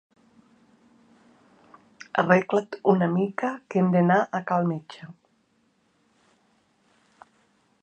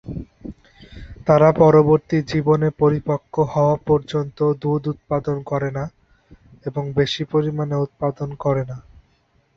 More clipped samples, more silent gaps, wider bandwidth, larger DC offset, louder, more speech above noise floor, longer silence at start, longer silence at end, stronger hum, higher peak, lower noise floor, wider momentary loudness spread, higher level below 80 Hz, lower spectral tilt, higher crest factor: neither; neither; first, 8.2 kHz vs 7.2 kHz; neither; second, -24 LUFS vs -19 LUFS; about the same, 44 dB vs 43 dB; first, 2.15 s vs 0.05 s; first, 2.7 s vs 0.75 s; neither; about the same, -4 dBFS vs -2 dBFS; first, -67 dBFS vs -61 dBFS; about the same, 20 LU vs 18 LU; second, -74 dBFS vs -46 dBFS; about the same, -8 dB/octave vs -8 dB/octave; first, 24 dB vs 18 dB